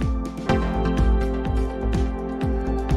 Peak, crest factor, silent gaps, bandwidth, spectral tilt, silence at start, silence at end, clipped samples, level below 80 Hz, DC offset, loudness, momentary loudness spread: -8 dBFS; 14 dB; none; 9 kHz; -7.5 dB/octave; 0 s; 0 s; under 0.1%; -24 dBFS; under 0.1%; -24 LUFS; 5 LU